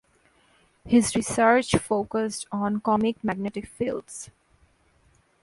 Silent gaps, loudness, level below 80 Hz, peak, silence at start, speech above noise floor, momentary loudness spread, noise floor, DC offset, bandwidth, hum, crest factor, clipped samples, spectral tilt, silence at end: none; -25 LUFS; -52 dBFS; -6 dBFS; 0.85 s; 38 dB; 13 LU; -63 dBFS; under 0.1%; 11.5 kHz; none; 20 dB; under 0.1%; -4.5 dB/octave; 1.2 s